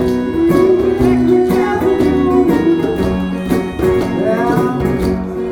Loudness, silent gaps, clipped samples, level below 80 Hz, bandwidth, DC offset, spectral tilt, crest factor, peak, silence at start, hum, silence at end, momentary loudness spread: -14 LUFS; none; under 0.1%; -30 dBFS; 17.5 kHz; under 0.1%; -7.5 dB/octave; 12 dB; 0 dBFS; 0 s; none; 0 s; 5 LU